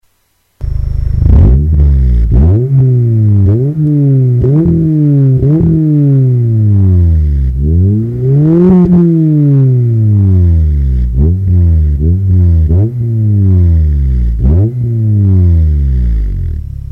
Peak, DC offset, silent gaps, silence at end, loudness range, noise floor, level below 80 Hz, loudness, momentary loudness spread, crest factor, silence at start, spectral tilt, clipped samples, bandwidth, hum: 0 dBFS; under 0.1%; none; 0.05 s; 2 LU; -57 dBFS; -14 dBFS; -9 LUFS; 5 LU; 8 dB; 0.6 s; -12.5 dB/octave; 0.4%; 2.3 kHz; none